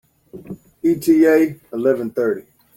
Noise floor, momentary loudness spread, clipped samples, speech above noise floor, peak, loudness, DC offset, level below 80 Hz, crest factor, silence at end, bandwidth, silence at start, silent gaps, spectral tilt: -37 dBFS; 22 LU; under 0.1%; 20 dB; -4 dBFS; -17 LUFS; under 0.1%; -60 dBFS; 16 dB; 0.35 s; 16.5 kHz; 0.35 s; none; -6.5 dB/octave